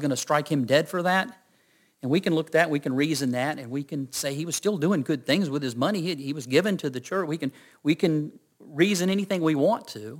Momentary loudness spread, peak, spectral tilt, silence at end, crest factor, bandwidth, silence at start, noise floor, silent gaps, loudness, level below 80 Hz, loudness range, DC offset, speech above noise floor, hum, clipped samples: 9 LU; -6 dBFS; -5 dB/octave; 0 s; 20 dB; 17 kHz; 0 s; -64 dBFS; none; -26 LUFS; -72 dBFS; 2 LU; under 0.1%; 39 dB; none; under 0.1%